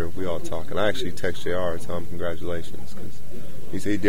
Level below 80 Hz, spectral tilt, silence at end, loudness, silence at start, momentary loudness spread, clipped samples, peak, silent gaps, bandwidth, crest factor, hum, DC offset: -46 dBFS; -5.5 dB/octave; 0 s; -29 LUFS; 0 s; 15 LU; under 0.1%; -6 dBFS; none; 16.5 kHz; 20 dB; none; 10%